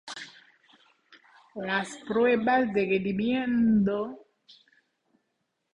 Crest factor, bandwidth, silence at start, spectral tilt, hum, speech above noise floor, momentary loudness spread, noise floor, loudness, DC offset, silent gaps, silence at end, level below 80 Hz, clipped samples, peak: 16 dB; 10.5 kHz; 0.05 s; -6.5 dB/octave; none; 53 dB; 17 LU; -79 dBFS; -26 LUFS; under 0.1%; none; 1.25 s; -64 dBFS; under 0.1%; -12 dBFS